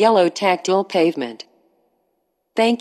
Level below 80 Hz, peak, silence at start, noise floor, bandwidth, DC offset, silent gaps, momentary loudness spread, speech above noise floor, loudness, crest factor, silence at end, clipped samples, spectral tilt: -82 dBFS; -2 dBFS; 0 s; -70 dBFS; 12.5 kHz; under 0.1%; none; 13 LU; 53 dB; -19 LUFS; 18 dB; 0 s; under 0.1%; -4.5 dB/octave